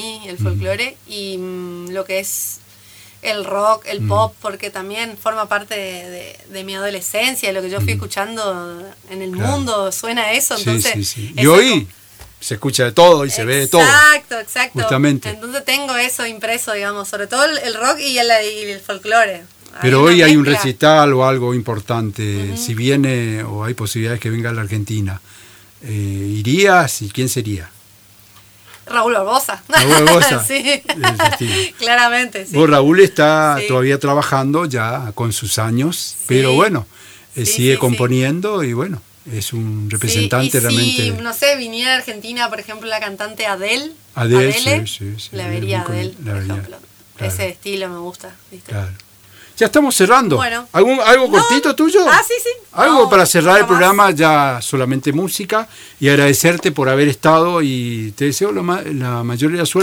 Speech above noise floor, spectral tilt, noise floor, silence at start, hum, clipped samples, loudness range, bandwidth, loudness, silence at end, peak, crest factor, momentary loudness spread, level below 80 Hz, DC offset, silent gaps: 31 dB; -4 dB/octave; -46 dBFS; 0 s; none; under 0.1%; 9 LU; over 20 kHz; -14 LUFS; 0 s; 0 dBFS; 16 dB; 15 LU; -52 dBFS; under 0.1%; none